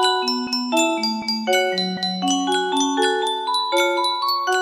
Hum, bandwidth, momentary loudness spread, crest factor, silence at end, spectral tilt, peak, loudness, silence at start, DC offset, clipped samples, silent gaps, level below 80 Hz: none; 15.5 kHz; 3 LU; 16 dB; 0 s; -2.5 dB/octave; -6 dBFS; -20 LUFS; 0 s; under 0.1%; under 0.1%; none; -68 dBFS